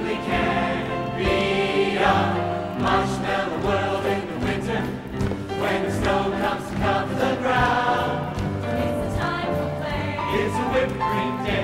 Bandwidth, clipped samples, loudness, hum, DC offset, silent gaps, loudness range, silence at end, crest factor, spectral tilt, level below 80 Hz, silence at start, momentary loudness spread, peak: 16 kHz; under 0.1%; -23 LUFS; none; under 0.1%; none; 2 LU; 0 s; 18 dB; -6 dB/octave; -40 dBFS; 0 s; 7 LU; -4 dBFS